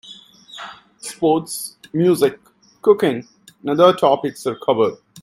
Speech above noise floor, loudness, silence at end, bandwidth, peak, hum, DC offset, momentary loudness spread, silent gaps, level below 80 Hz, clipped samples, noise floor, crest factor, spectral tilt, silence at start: 26 dB; -18 LUFS; 0 s; 15.5 kHz; 0 dBFS; none; under 0.1%; 20 LU; none; -64 dBFS; under 0.1%; -43 dBFS; 18 dB; -5.5 dB/octave; 0.05 s